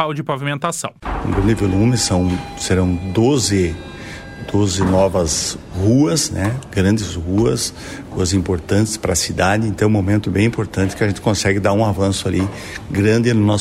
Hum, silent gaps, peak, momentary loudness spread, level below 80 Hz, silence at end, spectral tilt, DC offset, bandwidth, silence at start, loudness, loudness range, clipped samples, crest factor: none; none; -2 dBFS; 8 LU; -36 dBFS; 0 s; -5 dB/octave; under 0.1%; 14.5 kHz; 0 s; -17 LUFS; 1 LU; under 0.1%; 14 dB